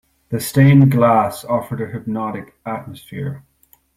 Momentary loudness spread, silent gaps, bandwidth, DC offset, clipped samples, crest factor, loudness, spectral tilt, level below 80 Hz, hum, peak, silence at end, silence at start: 18 LU; none; 15.5 kHz; under 0.1%; under 0.1%; 16 dB; -16 LUFS; -7.5 dB/octave; -50 dBFS; none; -2 dBFS; 0.6 s; 0.3 s